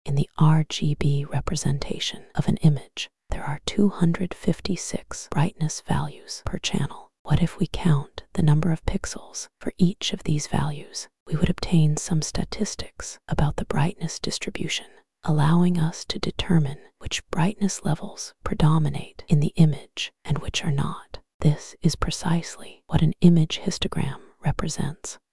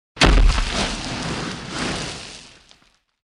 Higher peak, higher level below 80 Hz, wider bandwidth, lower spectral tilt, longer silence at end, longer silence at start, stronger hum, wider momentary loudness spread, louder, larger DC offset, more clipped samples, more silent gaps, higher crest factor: about the same, -2 dBFS vs -2 dBFS; second, -40 dBFS vs -24 dBFS; about the same, 12 kHz vs 11.5 kHz; first, -5.5 dB/octave vs -4 dB/octave; second, 0 s vs 0.8 s; about the same, 0.05 s vs 0.15 s; neither; second, 12 LU vs 17 LU; second, -25 LUFS vs -22 LUFS; first, 2% vs under 0.1%; neither; first, 7.19-7.25 s, 11.20-11.26 s, 21.34-21.40 s vs none; about the same, 20 dB vs 20 dB